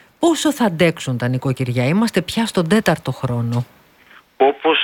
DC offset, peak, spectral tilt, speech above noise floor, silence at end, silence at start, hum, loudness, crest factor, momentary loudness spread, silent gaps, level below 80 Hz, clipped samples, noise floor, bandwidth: under 0.1%; 0 dBFS; -5.5 dB/octave; 31 dB; 0 s; 0.2 s; none; -18 LUFS; 18 dB; 6 LU; none; -52 dBFS; under 0.1%; -49 dBFS; 18 kHz